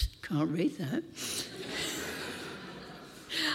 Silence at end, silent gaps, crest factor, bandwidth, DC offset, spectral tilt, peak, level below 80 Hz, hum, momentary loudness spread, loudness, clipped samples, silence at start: 0 s; none; 16 dB; 16.5 kHz; under 0.1%; -4 dB/octave; -18 dBFS; -46 dBFS; none; 13 LU; -35 LUFS; under 0.1%; 0 s